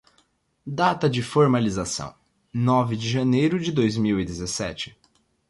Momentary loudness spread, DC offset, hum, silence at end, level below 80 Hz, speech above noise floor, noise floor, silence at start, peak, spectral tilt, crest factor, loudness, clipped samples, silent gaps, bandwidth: 14 LU; under 0.1%; none; 0.6 s; -50 dBFS; 43 dB; -66 dBFS; 0.65 s; -6 dBFS; -5.5 dB/octave; 18 dB; -23 LUFS; under 0.1%; none; 11.5 kHz